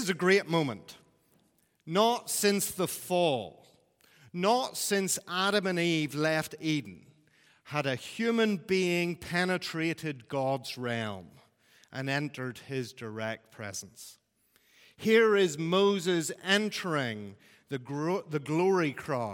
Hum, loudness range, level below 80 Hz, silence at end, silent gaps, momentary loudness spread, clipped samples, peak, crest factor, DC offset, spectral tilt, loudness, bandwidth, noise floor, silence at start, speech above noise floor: none; 8 LU; -74 dBFS; 0 s; none; 14 LU; under 0.1%; -8 dBFS; 22 dB; under 0.1%; -4 dB/octave; -30 LUFS; 17.5 kHz; -70 dBFS; 0 s; 40 dB